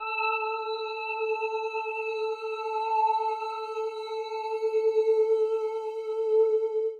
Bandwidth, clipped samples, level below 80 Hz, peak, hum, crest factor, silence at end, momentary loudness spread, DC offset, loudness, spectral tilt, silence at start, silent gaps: 7 kHz; under 0.1%; -90 dBFS; -16 dBFS; none; 12 dB; 0 s; 9 LU; under 0.1%; -28 LUFS; -0.5 dB/octave; 0 s; none